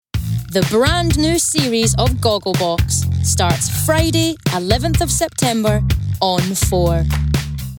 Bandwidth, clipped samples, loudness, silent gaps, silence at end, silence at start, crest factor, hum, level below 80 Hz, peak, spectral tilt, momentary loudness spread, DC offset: over 20 kHz; under 0.1%; -16 LUFS; none; 0 s; 0.15 s; 16 dB; none; -26 dBFS; 0 dBFS; -4.5 dB/octave; 4 LU; under 0.1%